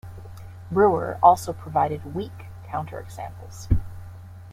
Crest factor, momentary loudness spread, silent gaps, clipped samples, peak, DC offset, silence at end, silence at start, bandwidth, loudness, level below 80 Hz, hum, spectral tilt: 22 dB; 24 LU; none; under 0.1%; -2 dBFS; under 0.1%; 0 s; 0.05 s; 16 kHz; -23 LUFS; -38 dBFS; none; -7 dB/octave